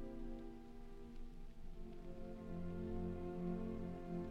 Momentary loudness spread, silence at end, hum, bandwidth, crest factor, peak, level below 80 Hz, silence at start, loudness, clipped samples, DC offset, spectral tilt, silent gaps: 13 LU; 0 s; none; 7 kHz; 14 dB; -32 dBFS; -52 dBFS; 0 s; -50 LUFS; under 0.1%; under 0.1%; -9 dB/octave; none